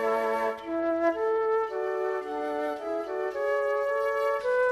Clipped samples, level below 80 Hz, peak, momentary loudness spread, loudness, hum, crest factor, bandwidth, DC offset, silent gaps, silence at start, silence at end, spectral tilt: under 0.1%; -66 dBFS; -14 dBFS; 5 LU; -28 LUFS; none; 14 dB; 13.5 kHz; under 0.1%; none; 0 s; 0 s; -4.5 dB/octave